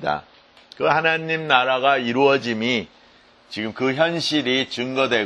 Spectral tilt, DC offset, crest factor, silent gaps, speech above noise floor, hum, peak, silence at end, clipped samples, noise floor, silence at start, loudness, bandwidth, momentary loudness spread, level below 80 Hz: -4.5 dB/octave; under 0.1%; 22 dB; none; 32 dB; none; 0 dBFS; 0 s; under 0.1%; -52 dBFS; 0 s; -20 LUFS; 11.5 kHz; 11 LU; -62 dBFS